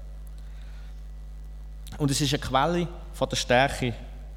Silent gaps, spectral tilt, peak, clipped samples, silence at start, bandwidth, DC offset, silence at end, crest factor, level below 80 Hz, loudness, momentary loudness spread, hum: none; -4.5 dB/octave; -8 dBFS; under 0.1%; 0 s; 17 kHz; under 0.1%; 0 s; 20 dB; -40 dBFS; -26 LUFS; 21 LU; none